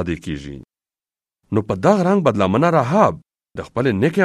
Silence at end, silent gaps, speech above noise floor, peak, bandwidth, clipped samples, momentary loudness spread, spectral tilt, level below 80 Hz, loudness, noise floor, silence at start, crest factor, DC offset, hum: 0 s; none; over 73 dB; 0 dBFS; 12.5 kHz; under 0.1%; 18 LU; -7.5 dB/octave; -46 dBFS; -18 LUFS; under -90 dBFS; 0 s; 18 dB; under 0.1%; none